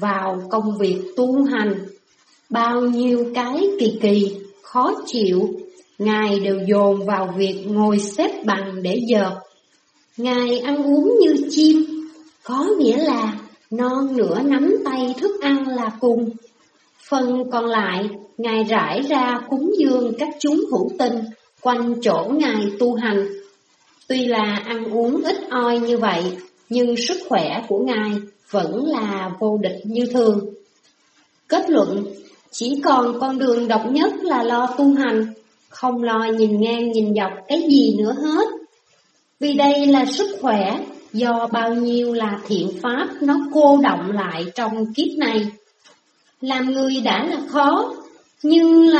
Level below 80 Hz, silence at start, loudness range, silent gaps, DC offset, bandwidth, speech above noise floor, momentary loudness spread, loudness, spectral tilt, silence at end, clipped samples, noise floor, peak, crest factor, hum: -70 dBFS; 0 s; 3 LU; none; under 0.1%; 8.4 kHz; 42 dB; 9 LU; -19 LUFS; -5.5 dB/octave; 0 s; under 0.1%; -60 dBFS; -2 dBFS; 18 dB; none